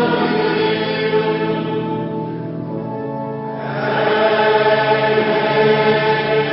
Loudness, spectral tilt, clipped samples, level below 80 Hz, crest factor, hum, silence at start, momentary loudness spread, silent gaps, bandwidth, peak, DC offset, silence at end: -17 LUFS; -10.5 dB/octave; under 0.1%; -54 dBFS; 14 dB; none; 0 s; 11 LU; none; 5.8 kHz; -2 dBFS; under 0.1%; 0 s